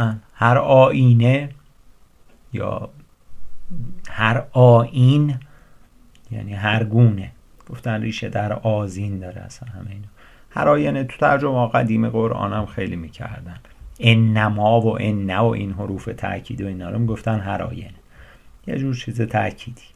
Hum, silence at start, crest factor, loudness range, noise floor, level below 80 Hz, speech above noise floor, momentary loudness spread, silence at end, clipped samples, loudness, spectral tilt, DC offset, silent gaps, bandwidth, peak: none; 0 s; 20 dB; 8 LU; -49 dBFS; -44 dBFS; 31 dB; 21 LU; 0.2 s; under 0.1%; -19 LUFS; -8 dB/octave; under 0.1%; none; 10 kHz; 0 dBFS